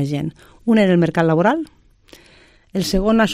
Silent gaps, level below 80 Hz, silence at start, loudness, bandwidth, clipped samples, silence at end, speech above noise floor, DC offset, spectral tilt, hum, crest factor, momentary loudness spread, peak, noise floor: none; -38 dBFS; 0 s; -18 LUFS; 15 kHz; under 0.1%; 0 s; 33 dB; under 0.1%; -6.5 dB/octave; none; 14 dB; 13 LU; -4 dBFS; -50 dBFS